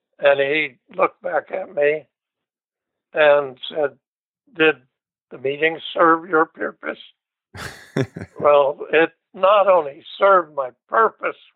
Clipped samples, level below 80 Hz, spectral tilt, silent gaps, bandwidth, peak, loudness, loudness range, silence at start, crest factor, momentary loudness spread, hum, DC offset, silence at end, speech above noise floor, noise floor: under 0.1%; -66 dBFS; -6 dB/octave; 4.08-4.34 s, 5.22-5.27 s; 10 kHz; -2 dBFS; -19 LUFS; 4 LU; 0.2 s; 18 dB; 13 LU; none; under 0.1%; 0.25 s; 68 dB; -87 dBFS